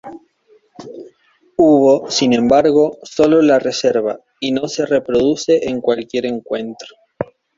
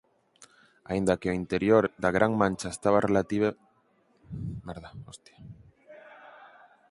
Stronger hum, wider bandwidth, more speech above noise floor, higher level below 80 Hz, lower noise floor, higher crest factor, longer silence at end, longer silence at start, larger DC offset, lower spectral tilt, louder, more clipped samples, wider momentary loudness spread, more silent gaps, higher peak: neither; second, 7.8 kHz vs 11.5 kHz; about the same, 40 dB vs 40 dB; about the same, -52 dBFS vs -54 dBFS; second, -55 dBFS vs -67 dBFS; second, 16 dB vs 24 dB; about the same, 0.35 s vs 0.45 s; second, 0.05 s vs 0.4 s; neither; second, -5 dB/octave vs -6.5 dB/octave; first, -15 LUFS vs -27 LUFS; neither; second, 17 LU vs 22 LU; neither; first, 0 dBFS vs -6 dBFS